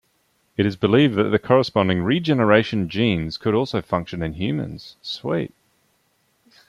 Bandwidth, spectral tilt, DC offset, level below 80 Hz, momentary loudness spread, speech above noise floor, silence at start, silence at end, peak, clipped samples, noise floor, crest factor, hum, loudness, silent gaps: 11.5 kHz; -7.5 dB/octave; under 0.1%; -52 dBFS; 13 LU; 45 dB; 0.6 s; 1.2 s; -4 dBFS; under 0.1%; -66 dBFS; 18 dB; none; -21 LUFS; none